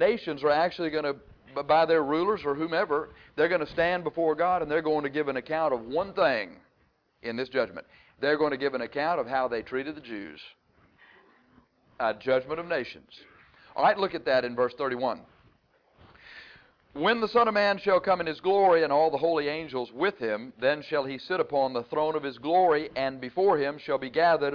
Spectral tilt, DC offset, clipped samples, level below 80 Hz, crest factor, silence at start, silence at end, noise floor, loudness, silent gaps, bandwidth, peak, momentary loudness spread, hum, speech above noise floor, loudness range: -7 dB/octave; under 0.1%; under 0.1%; -64 dBFS; 14 dB; 0 s; 0 s; -69 dBFS; -27 LUFS; none; 5.4 kHz; -12 dBFS; 13 LU; none; 42 dB; 8 LU